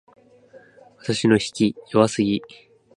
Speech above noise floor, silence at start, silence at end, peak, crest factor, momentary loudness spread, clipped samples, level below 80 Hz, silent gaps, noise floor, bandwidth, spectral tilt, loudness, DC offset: 30 dB; 1.05 s; 0.5 s; -2 dBFS; 22 dB; 9 LU; under 0.1%; -58 dBFS; none; -50 dBFS; 11 kHz; -5.5 dB/octave; -21 LUFS; under 0.1%